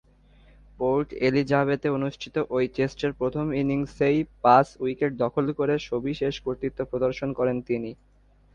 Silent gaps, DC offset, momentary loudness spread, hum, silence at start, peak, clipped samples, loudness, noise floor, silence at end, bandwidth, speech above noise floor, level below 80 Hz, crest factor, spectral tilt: none; under 0.1%; 8 LU; 50 Hz at -50 dBFS; 0.8 s; -4 dBFS; under 0.1%; -25 LUFS; -55 dBFS; 0.6 s; 9 kHz; 30 dB; -52 dBFS; 22 dB; -7.5 dB/octave